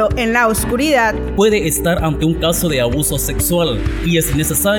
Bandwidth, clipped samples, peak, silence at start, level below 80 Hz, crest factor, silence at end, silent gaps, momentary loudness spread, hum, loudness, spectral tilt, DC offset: 19.5 kHz; under 0.1%; 0 dBFS; 0 s; -26 dBFS; 14 dB; 0 s; none; 3 LU; none; -15 LUFS; -4 dB/octave; under 0.1%